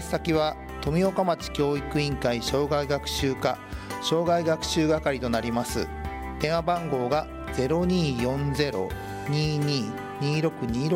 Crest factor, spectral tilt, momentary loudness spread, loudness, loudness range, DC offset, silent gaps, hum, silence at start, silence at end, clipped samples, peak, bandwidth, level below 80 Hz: 18 dB; -5.5 dB/octave; 7 LU; -27 LUFS; 1 LU; under 0.1%; none; none; 0 s; 0 s; under 0.1%; -8 dBFS; 16 kHz; -42 dBFS